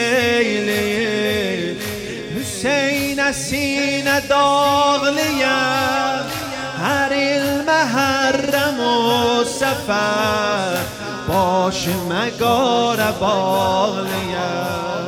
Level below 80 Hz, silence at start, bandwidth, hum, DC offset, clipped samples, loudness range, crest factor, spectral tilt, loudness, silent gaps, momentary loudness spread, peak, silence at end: -48 dBFS; 0 s; 17 kHz; none; under 0.1%; under 0.1%; 3 LU; 14 dB; -3.5 dB/octave; -18 LUFS; none; 7 LU; -4 dBFS; 0 s